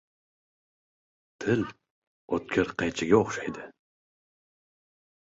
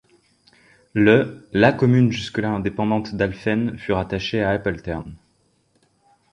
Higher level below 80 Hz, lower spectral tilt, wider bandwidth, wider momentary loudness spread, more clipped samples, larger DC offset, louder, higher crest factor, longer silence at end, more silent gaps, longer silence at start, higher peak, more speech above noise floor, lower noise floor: second, -60 dBFS vs -46 dBFS; second, -5.5 dB/octave vs -7.5 dB/octave; second, 8 kHz vs 10 kHz; first, 14 LU vs 11 LU; neither; neither; second, -28 LUFS vs -21 LUFS; about the same, 24 dB vs 20 dB; first, 1.65 s vs 1.15 s; first, 1.90-2.28 s vs none; first, 1.4 s vs 0.95 s; second, -6 dBFS vs -2 dBFS; first, over 63 dB vs 44 dB; first, under -90 dBFS vs -64 dBFS